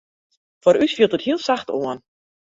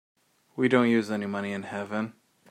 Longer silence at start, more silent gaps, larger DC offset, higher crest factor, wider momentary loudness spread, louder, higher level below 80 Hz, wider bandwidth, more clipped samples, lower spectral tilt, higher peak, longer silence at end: about the same, 0.65 s vs 0.55 s; neither; neither; about the same, 18 dB vs 22 dB; about the same, 10 LU vs 12 LU; first, -20 LUFS vs -27 LUFS; first, -64 dBFS vs -76 dBFS; second, 7.8 kHz vs 11 kHz; neither; second, -5 dB/octave vs -6.5 dB/octave; first, -2 dBFS vs -8 dBFS; first, 0.6 s vs 0.4 s